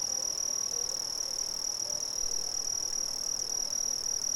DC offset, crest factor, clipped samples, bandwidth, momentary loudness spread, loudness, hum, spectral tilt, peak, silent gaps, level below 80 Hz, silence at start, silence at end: under 0.1%; 12 dB; under 0.1%; 18 kHz; 2 LU; -30 LUFS; none; 1.5 dB/octave; -20 dBFS; none; -58 dBFS; 0 s; 0 s